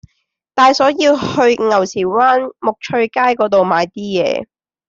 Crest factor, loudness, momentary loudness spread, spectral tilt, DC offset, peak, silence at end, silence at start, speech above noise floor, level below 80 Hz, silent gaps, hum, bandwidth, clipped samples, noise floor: 14 dB; -14 LUFS; 7 LU; -4.5 dB/octave; under 0.1%; -2 dBFS; 0.45 s; 0.55 s; 54 dB; -56 dBFS; none; none; 7.8 kHz; under 0.1%; -68 dBFS